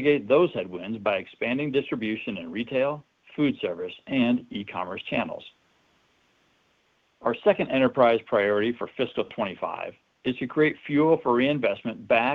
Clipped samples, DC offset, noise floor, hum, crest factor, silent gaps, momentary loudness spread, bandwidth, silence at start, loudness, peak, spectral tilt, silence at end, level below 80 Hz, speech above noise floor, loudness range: under 0.1%; under 0.1%; -67 dBFS; none; 20 dB; none; 11 LU; 5.4 kHz; 0 s; -26 LUFS; -6 dBFS; -8 dB/octave; 0 s; -66 dBFS; 42 dB; 6 LU